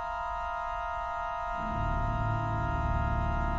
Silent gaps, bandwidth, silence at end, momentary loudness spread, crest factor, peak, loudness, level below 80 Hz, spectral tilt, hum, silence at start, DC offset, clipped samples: none; 7.4 kHz; 0 s; 3 LU; 14 dB; -18 dBFS; -32 LUFS; -36 dBFS; -8 dB/octave; none; 0 s; under 0.1%; under 0.1%